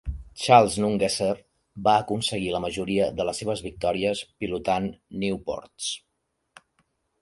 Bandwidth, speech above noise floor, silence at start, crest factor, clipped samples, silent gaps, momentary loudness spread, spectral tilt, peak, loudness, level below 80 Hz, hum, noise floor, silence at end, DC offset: 11.5 kHz; 52 dB; 0.05 s; 24 dB; under 0.1%; none; 13 LU; -4.5 dB/octave; -2 dBFS; -25 LUFS; -46 dBFS; none; -77 dBFS; 1.25 s; under 0.1%